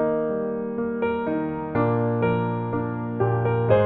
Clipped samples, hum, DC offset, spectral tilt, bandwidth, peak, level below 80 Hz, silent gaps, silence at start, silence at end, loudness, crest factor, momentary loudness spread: under 0.1%; none; under 0.1%; -11.5 dB/octave; 4.1 kHz; -6 dBFS; -52 dBFS; none; 0 s; 0 s; -25 LUFS; 18 dB; 5 LU